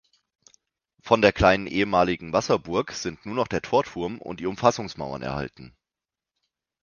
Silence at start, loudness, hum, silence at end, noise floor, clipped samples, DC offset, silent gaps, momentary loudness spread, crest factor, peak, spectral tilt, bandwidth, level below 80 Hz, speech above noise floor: 1.05 s; -24 LUFS; none; 1.15 s; -89 dBFS; under 0.1%; under 0.1%; none; 12 LU; 24 dB; -2 dBFS; -5 dB/octave; 7.2 kHz; -46 dBFS; 66 dB